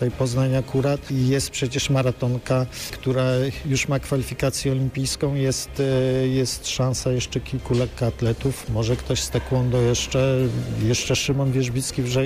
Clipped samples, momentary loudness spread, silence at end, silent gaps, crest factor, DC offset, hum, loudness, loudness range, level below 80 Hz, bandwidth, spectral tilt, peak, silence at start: under 0.1%; 4 LU; 0 s; none; 10 dB; under 0.1%; none; -23 LUFS; 2 LU; -40 dBFS; 15.5 kHz; -5 dB/octave; -12 dBFS; 0 s